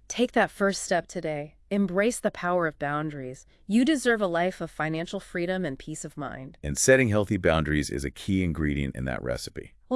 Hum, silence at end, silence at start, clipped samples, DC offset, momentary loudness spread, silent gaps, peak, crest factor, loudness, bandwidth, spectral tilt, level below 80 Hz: none; 0 s; 0.1 s; under 0.1%; under 0.1%; 13 LU; none; -6 dBFS; 20 dB; -27 LUFS; 12 kHz; -5 dB/octave; -46 dBFS